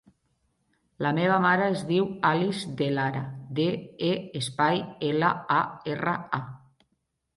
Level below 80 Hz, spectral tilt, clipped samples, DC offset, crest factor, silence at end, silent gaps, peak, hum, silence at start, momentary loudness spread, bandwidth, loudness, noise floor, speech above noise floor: -66 dBFS; -6 dB/octave; under 0.1%; under 0.1%; 20 dB; 0.8 s; none; -8 dBFS; none; 1 s; 9 LU; 11.5 kHz; -27 LUFS; -77 dBFS; 50 dB